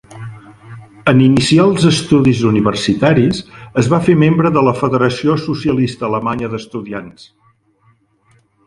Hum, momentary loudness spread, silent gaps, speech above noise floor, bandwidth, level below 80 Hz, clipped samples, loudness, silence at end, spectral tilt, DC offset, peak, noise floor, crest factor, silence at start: none; 14 LU; none; 42 dB; 11.5 kHz; -44 dBFS; under 0.1%; -13 LUFS; 1.55 s; -6.5 dB/octave; under 0.1%; 0 dBFS; -55 dBFS; 14 dB; 0.1 s